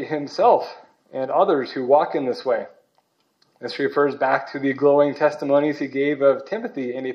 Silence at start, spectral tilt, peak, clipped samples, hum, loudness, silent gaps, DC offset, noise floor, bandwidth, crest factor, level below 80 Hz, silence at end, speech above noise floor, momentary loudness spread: 0 s; -6.5 dB/octave; -2 dBFS; under 0.1%; none; -21 LUFS; none; under 0.1%; -66 dBFS; 6.8 kHz; 18 dB; -80 dBFS; 0 s; 46 dB; 11 LU